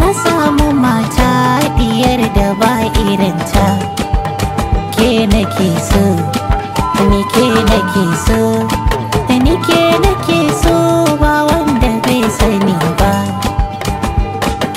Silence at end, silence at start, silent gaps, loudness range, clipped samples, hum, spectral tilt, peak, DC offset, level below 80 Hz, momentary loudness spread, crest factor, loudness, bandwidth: 0 s; 0 s; none; 2 LU; under 0.1%; none; -5.5 dB/octave; 0 dBFS; under 0.1%; -20 dBFS; 6 LU; 12 dB; -12 LUFS; 16.5 kHz